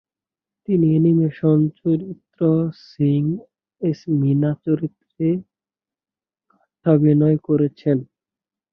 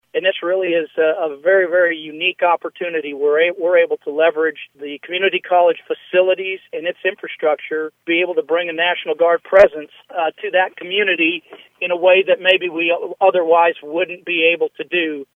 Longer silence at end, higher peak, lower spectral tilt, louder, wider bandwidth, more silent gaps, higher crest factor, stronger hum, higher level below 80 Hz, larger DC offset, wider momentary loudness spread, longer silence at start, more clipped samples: first, 0.7 s vs 0.1 s; about the same, -2 dBFS vs 0 dBFS; first, -11.5 dB/octave vs -5.5 dB/octave; second, -20 LUFS vs -17 LUFS; about the same, 5.8 kHz vs 5.4 kHz; neither; about the same, 18 dB vs 18 dB; neither; about the same, -62 dBFS vs -60 dBFS; neither; about the same, 10 LU vs 10 LU; first, 0.7 s vs 0.15 s; neither